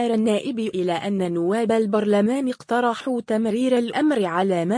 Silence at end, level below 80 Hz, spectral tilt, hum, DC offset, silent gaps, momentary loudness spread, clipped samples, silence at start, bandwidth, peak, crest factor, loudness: 0 s; -68 dBFS; -6 dB/octave; none; under 0.1%; none; 4 LU; under 0.1%; 0 s; 10.5 kHz; -8 dBFS; 12 dB; -22 LUFS